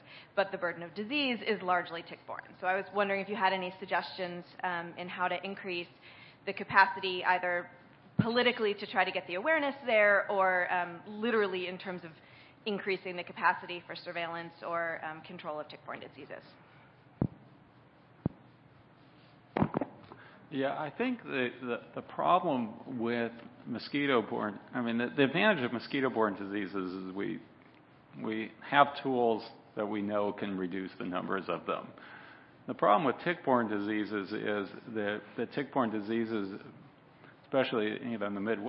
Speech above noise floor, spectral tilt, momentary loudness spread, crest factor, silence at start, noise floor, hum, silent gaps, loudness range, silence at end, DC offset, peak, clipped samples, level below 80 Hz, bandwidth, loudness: 27 dB; -3 dB/octave; 15 LU; 26 dB; 0.05 s; -60 dBFS; none; none; 10 LU; 0 s; under 0.1%; -8 dBFS; under 0.1%; -70 dBFS; 5.6 kHz; -33 LUFS